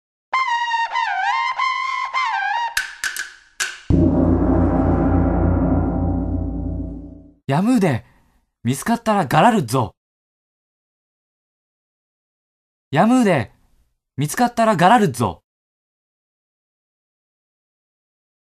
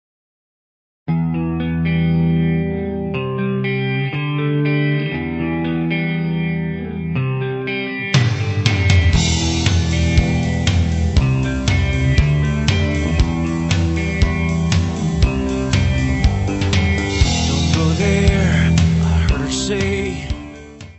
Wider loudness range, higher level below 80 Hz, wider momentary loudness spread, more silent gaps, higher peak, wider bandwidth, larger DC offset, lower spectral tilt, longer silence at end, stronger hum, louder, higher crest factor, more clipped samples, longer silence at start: about the same, 4 LU vs 4 LU; second, -34 dBFS vs -24 dBFS; first, 12 LU vs 7 LU; first, 9.97-12.91 s vs none; about the same, 0 dBFS vs 0 dBFS; first, 14 kHz vs 8.4 kHz; neither; about the same, -6 dB/octave vs -6 dB/octave; first, 3.05 s vs 0.05 s; neither; about the same, -19 LUFS vs -18 LUFS; about the same, 20 dB vs 16 dB; neither; second, 0.3 s vs 1.1 s